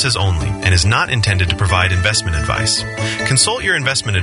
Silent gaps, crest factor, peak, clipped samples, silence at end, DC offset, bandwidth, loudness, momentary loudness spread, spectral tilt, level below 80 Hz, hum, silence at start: none; 16 dB; 0 dBFS; under 0.1%; 0 s; under 0.1%; 11 kHz; -15 LUFS; 5 LU; -3 dB/octave; -30 dBFS; none; 0 s